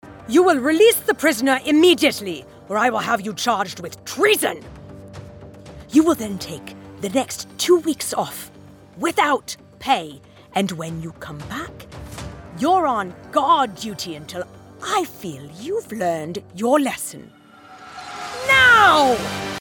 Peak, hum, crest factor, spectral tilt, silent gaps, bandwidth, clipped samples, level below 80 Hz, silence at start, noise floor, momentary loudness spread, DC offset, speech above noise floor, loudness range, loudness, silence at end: -2 dBFS; none; 18 dB; -3.5 dB/octave; none; 18 kHz; under 0.1%; -52 dBFS; 0.05 s; -44 dBFS; 20 LU; under 0.1%; 24 dB; 8 LU; -19 LUFS; 0 s